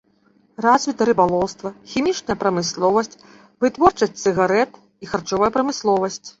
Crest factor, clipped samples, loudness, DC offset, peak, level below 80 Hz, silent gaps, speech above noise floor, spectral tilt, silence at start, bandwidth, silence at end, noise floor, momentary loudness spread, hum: 18 dB; under 0.1%; -20 LUFS; under 0.1%; -2 dBFS; -52 dBFS; none; 39 dB; -4.5 dB/octave; 0.6 s; 8 kHz; 0.1 s; -59 dBFS; 10 LU; none